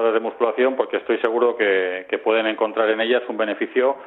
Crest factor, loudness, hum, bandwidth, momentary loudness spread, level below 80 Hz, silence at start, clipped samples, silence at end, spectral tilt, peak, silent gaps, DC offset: 16 dB; -21 LUFS; none; 4.1 kHz; 5 LU; -72 dBFS; 0 s; under 0.1%; 0 s; -6.5 dB/octave; -4 dBFS; none; under 0.1%